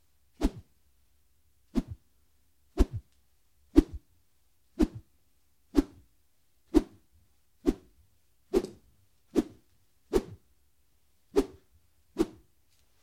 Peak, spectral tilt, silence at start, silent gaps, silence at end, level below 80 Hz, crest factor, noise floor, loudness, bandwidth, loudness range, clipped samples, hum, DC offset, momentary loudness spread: -6 dBFS; -7 dB/octave; 0.4 s; none; 0.75 s; -42 dBFS; 28 dB; -73 dBFS; -32 LUFS; 16 kHz; 3 LU; under 0.1%; none; under 0.1%; 21 LU